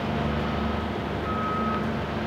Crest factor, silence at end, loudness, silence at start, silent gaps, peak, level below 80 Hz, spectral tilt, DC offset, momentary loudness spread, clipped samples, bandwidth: 12 dB; 0 s; -28 LUFS; 0 s; none; -16 dBFS; -38 dBFS; -7 dB/octave; under 0.1%; 3 LU; under 0.1%; 15 kHz